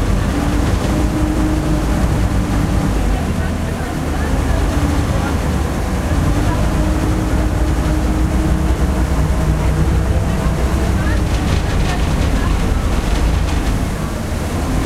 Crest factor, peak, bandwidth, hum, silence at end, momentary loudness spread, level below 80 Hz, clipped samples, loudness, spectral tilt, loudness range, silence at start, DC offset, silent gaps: 14 dB; -2 dBFS; 15 kHz; none; 0 s; 3 LU; -18 dBFS; under 0.1%; -17 LUFS; -6.5 dB/octave; 1 LU; 0 s; under 0.1%; none